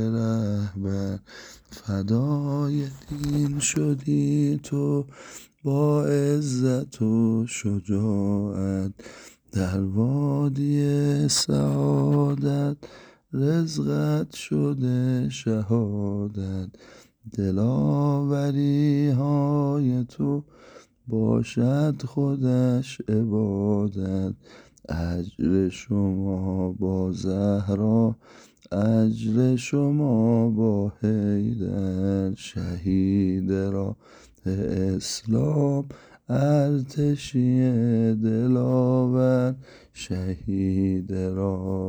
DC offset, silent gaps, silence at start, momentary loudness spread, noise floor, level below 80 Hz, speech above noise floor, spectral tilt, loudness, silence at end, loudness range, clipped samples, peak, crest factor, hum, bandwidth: under 0.1%; none; 0 s; 9 LU; -50 dBFS; -52 dBFS; 27 dB; -7 dB/octave; -24 LUFS; 0 s; 3 LU; under 0.1%; -10 dBFS; 14 dB; none; over 20 kHz